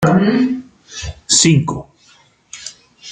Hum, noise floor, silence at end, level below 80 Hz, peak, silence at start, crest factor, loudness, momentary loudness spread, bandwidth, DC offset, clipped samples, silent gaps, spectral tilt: none; -51 dBFS; 0 s; -44 dBFS; 0 dBFS; 0 s; 18 dB; -14 LUFS; 22 LU; 9.6 kHz; under 0.1%; under 0.1%; none; -4 dB/octave